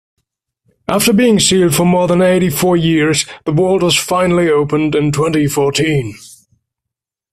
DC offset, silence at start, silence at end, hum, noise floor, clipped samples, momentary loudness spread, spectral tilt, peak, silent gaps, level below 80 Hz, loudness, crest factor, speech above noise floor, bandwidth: under 0.1%; 0.9 s; 1.05 s; none; -82 dBFS; under 0.1%; 6 LU; -4.5 dB/octave; 0 dBFS; none; -44 dBFS; -13 LUFS; 14 dB; 70 dB; 16 kHz